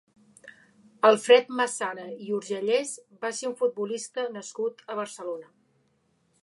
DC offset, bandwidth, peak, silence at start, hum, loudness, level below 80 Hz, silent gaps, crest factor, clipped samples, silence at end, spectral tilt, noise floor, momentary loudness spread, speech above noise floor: under 0.1%; 11.5 kHz; -6 dBFS; 0.45 s; none; -27 LUFS; -86 dBFS; none; 22 dB; under 0.1%; 1 s; -2.5 dB/octave; -69 dBFS; 15 LU; 43 dB